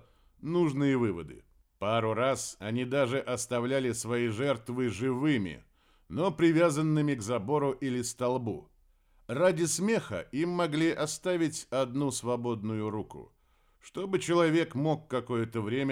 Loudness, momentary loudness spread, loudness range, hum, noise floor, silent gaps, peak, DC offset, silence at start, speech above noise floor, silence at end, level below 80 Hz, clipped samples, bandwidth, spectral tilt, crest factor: -30 LUFS; 11 LU; 2 LU; none; -65 dBFS; none; -12 dBFS; under 0.1%; 0.4 s; 36 dB; 0 s; -64 dBFS; under 0.1%; 16 kHz; -5.5 dB/octave; 18 dB